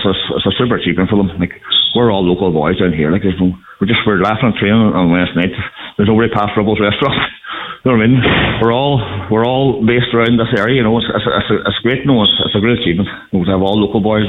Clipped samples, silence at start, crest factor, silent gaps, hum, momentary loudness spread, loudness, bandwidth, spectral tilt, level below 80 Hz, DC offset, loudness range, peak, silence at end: under 0.1%; 0 s; 12 dB; none; none; 7 LU; -13 LUFS; 4.8 kHz; -8.5 dB/octave; -38 dBFS; under 0.1%; 1 LU; -2 dBFS; 0 s